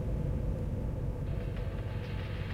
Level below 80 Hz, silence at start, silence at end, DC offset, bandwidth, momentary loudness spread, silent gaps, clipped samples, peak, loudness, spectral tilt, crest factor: -38 dBFS; 0 s; 0 s; under 0.1%; 9.4 kHz; 3 LU; none; under 0.1%; -22 dBFS; -37 LUFS; -8.5 dB/octave; 12 dB